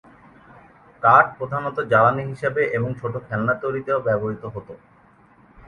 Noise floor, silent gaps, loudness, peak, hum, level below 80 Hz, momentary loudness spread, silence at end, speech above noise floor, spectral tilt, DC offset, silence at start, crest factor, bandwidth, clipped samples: -53 dBFS; none; -21 LUFS; 0 dBFS; none; -56 dBFS; 14 LU; 0.9 s; 32 dB; -8.5 dB/octave; under 0.1%; 1 s; 22 dB; 10.5 kHz; under 0.1%